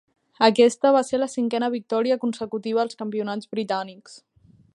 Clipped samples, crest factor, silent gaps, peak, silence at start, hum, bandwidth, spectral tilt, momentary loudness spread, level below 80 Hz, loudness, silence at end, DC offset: under 0.1%; 20 dB; none; -2 dBFS; 0.4 s; none; 11.5 kHz; -4.5 dB/octave; 12 LU; -72 dBFS; -23 LUFS; 0.6 s; under 0.1%